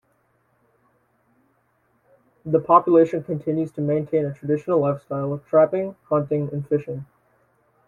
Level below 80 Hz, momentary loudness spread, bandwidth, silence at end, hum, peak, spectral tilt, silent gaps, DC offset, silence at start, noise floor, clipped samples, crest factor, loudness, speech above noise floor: -64 dBFS; 10 LU; 7.2 kHz; 0.85 s; none; -2 dBFS; -10.5 dB/octave; none; under 0.1%; 2.45 s; -66 dBFS; under 0.1%; 20 dB; -21 LUFS; 45 dB